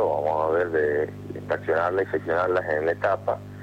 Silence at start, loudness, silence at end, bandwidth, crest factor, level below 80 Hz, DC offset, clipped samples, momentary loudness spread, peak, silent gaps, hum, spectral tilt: 0 s; -25 LUFS; 0 s; 9.4 kHz; 12 dB; -58 dBFS; under 0.1%; under 0.1%; 7 LU; -12 dBFS; none; 50 Hz at -40 dBFS; -7.5 dB/octave